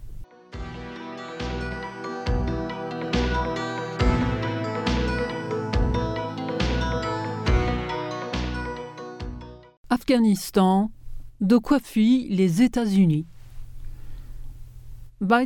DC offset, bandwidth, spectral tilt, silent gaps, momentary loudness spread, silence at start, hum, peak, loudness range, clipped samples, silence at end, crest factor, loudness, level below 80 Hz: under 0.1%; 17.5 kHz; -6.5 dB/octave; 9.77-9.84 s; 19 LU; 0 s; none; -6 dBFS; 7 LU; under 0.1%; 0 s; 18 dB; -24 LUFS; -34 dBFS